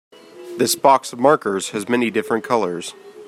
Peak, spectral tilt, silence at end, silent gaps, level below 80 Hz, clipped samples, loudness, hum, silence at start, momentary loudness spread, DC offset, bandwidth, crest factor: -2 dBFS; -3.5 dB/octave; 0 s; none; -68 dBFS; under 0.1%; -18 LUFS; none; 0.35 s; 12 LU; under 0.1%; 16 kHz; 18 dB